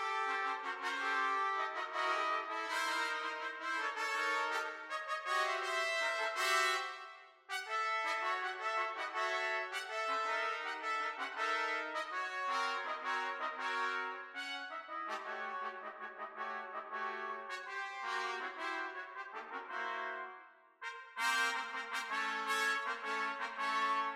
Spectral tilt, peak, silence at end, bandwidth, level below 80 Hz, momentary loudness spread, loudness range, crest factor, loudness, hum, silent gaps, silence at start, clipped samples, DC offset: 1 dB/octave; -20 dBFS; 0 s; 16 kHz; under -90 dBFS; 10 LU; 6 LU; 18 dB; -37 LUFS; none; none; 0 s; under 0.1%; under 0.1%